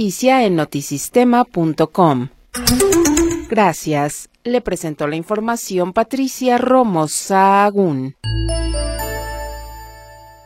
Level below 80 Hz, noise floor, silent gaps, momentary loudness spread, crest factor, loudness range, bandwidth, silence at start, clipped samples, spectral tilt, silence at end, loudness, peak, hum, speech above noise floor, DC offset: -32 dBFS; -40 dBFS; none; 11 LU; 16 dB; 3 LU; 16.5 kHz; 0 s; under 0.1%; -4.5 dB/octave; 0.15 s; -16 LUFS; 0 dBFS; none; 24 dB; under 0.1%